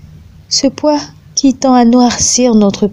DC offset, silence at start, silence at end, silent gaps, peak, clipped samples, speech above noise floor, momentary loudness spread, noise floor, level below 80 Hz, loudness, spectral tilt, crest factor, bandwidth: under 0.1%; 0.5 s; 0 s; none; 0 dBFS; under 0.1%; 27 dB; 7 LU; -36 dBFS; -40 dBFS; -10 LUFS; -3.5 dB/octave; 10 dB; 11 kHz